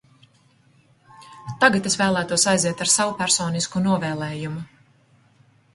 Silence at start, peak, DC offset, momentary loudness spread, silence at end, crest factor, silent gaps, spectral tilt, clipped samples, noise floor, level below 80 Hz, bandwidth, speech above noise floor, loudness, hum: 1.2 s; -2 dBFS; under 0.1%; 15 LU; 1.1 s; 22 dB; none; -3 dB/octave; under 0.1%; -58 dBFS; -58 dBFS; 11.5 kHz; 37 dB; -20 LUFS; none